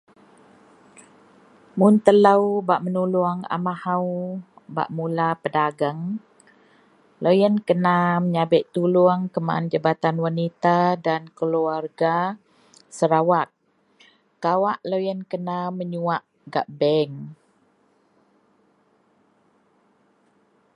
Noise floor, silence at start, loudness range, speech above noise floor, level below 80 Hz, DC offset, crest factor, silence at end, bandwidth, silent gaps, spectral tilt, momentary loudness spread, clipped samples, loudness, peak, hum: -63 dBFS; 1.75 s; 7 LU; 42 dB; -72 dBFS; under 0.1%; 22 dB; 3.45 s; 11 kHz; none; -7.5 dB/octave; 11 LU; under 0.1%; -22 LUFS; 0 dBFS; none